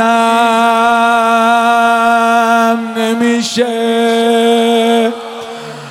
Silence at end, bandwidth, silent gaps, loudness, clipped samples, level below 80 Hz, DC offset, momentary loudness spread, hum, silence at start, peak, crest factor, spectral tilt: 0 s; 16 kHz; none; -11 LUFS; under 0.1%; -62 dBFS; under 0.1%; 7 LU; none; 0 s; 0 dBFS; 10 dB; -3.5 dB/octave